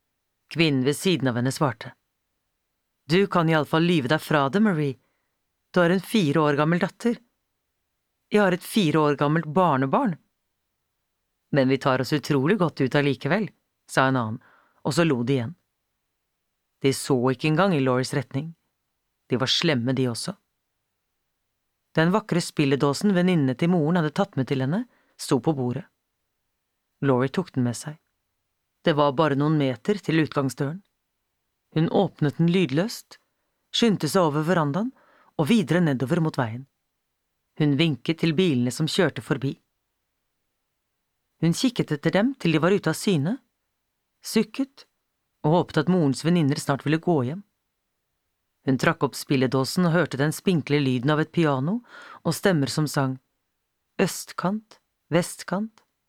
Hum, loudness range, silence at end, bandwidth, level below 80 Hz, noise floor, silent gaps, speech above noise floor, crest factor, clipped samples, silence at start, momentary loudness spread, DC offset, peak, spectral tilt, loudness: none; 4 LU; 0.4 s; 16 kHz; -66 dBFS; -78 dBFS; none; 55 dB; 20 dB; under 0.1%; 0.5 s; 10 LU; under 0.1%; -4 dBFS; -6 dB/octave; -24 LUFS